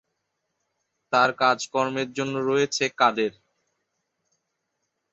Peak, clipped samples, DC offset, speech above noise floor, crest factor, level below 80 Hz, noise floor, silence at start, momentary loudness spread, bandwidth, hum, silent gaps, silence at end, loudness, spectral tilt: -6 dBFS; under 0.1%; under 0.1%; 55 dB; 22 dB; -72 dBFS; -79 dBFS; 1.1 s; 7 LU; 8.2 kHz; none; none; 1.8 s; -23 LUFS; -3.5 dB/octave